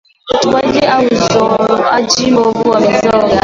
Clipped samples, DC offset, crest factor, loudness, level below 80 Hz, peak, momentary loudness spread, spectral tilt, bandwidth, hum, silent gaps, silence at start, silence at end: under 0.1%; under 0.1%; 10 dB; -11 LUFS; -42 dBFS; 0 dBFS; 1 LU; -4 dB/octave; 7.8 kHz; none; none; 0.25 s; 0.05 s